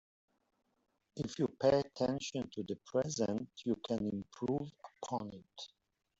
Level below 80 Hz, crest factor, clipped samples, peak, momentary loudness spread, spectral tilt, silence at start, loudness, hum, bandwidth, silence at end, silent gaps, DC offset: -70 dBFS; 20 dB; under 0.1%; -18 dBFS; 17 LU; -5.5 dB/octave; 1.15 s; -37 LUFS; none; 8 kHz; 0.55 s; none; under 0.1%